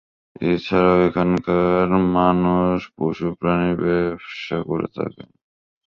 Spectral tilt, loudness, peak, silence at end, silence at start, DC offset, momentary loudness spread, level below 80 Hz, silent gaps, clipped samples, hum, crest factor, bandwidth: -9 dB/octave; -20 LUFS; -2 dBFS; 0.65 s; 0.4 s; under 0.1%; 10 LU; -44 dBFS; none; under 0.1%; none; 18 dB; 6.8 kHz